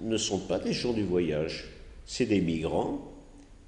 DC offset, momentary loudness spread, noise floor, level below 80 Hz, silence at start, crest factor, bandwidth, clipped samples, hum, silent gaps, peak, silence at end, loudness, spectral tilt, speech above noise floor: under 0.1%; 12 LU; -51 dBFS; -50 dBFS; 0 s; 16 dB; 10 kHz; under 0.1%; none; none; -14 dBFS; 0 s; -30 LUFS; -5 dB/octave; 22 dB